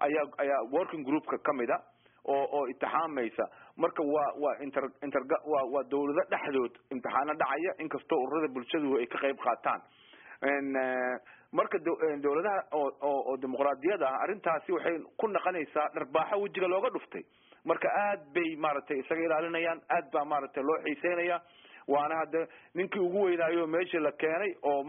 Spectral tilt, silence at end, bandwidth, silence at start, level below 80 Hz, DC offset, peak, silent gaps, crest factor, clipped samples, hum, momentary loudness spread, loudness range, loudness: 0.5 dB/octave; 0 s; 3.8 kHz; 0 s; -80 dBFS; under 0.1%; -14 dBFS; none; 18 dB; under 0.1%; none; 5 LU; 1 LU; -32 LUFS